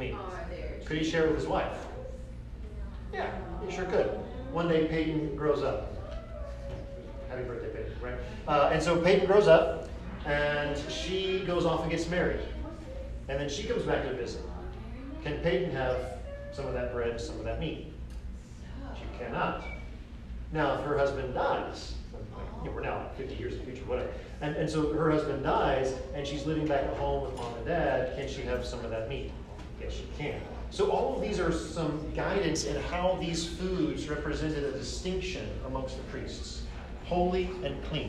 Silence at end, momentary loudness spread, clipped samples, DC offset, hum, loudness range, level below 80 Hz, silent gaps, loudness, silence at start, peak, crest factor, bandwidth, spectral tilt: 0 s; 14 LU; under 0.1%; under 0.1%; none; 9 LU; -42 dBFS; none; -32 LUFS; 0 s; -8 dBFS; 22 dB; 11.5 kHz; -5.5 dB/octave